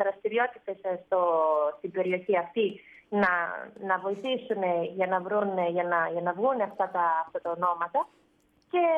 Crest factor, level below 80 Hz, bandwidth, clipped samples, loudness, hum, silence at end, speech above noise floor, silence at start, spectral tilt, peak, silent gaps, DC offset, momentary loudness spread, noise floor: 16 dB; -76 dBFS; 6.4 kHz; under 0.1%; -28 LUFS; none; 0 s; 38 dB; 0 s; -7.5 dB/octave; -12 dBFS; none; under 0.1%; 7 LU; -66 dBFS